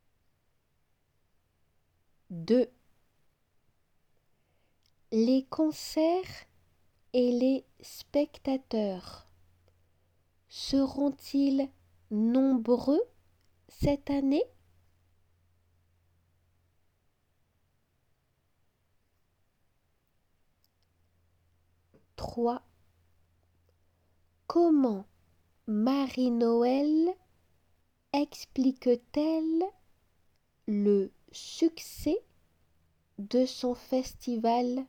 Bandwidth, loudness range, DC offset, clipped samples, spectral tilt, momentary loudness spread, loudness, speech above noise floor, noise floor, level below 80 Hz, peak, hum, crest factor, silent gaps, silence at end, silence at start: 17.5 kHz; 8 LU; under 0.1%; under 0.1%; -6 dB/octave; 14 LU; -29 LUFS; 46 dB; -74 dBFS; -58 dBFS; -14 dBFS; none; 18 dB; none; 0.05 s; 2.3 s